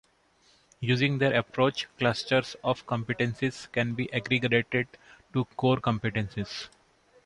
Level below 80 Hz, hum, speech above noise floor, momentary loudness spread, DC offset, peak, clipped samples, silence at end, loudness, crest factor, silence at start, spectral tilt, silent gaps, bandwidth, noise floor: -58 dBFS; none; 37 dB; 9 LU; under 0.1%; -10 dBFS; under 0.1%; 0.6 s; -28 LUFS; 20 dB; 0.8 s; -6 dB/octave; none; 11 kHz; -64 dBFS